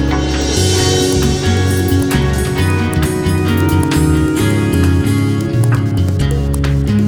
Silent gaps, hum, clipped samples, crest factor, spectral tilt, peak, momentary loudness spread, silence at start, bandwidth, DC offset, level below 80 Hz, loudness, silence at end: none; none; under 0.1%; 12 dB; -5.5 dB/octave; -2 dBFS; 3 LU; 0 s; over 20 kHz; under 0.1%; -24 dBFS; -14 LUFS; 0 s